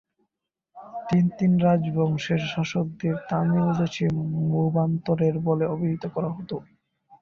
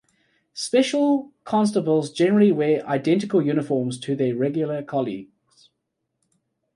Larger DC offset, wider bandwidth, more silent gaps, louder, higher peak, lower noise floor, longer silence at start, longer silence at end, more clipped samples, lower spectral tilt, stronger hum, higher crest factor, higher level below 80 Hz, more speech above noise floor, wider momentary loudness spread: neither; second, 7 kHz vs 11.5 kHz; neither; about the same, -24 LUFS vs -22 LUFS; second, -10 dBFS vs -6 dBFS; first, -82 dBFS vs -78 dBFS; first, 0.75 s vs 0.55 s; second, 0.6 s vs 1.5 s; neither; first, -8 dB/octave vs -6 dB/octave; neither; about the same, 14 dB vs 16 dB; first, -58 dBFS vs -68 dBFS; about the same, 59 dB vs 57 dB; about the same, 9 LU vs 9 LU